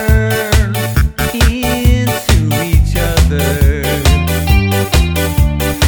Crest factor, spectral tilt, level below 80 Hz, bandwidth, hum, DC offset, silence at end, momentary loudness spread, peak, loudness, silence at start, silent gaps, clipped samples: 12 dB; -5 dB/octave; -14 dBFS; over 20 kHz; none; under 0.1%; 0 s; 2 LU; 0 dBFS; -13 LUFS; 0 s; none; under 0.1%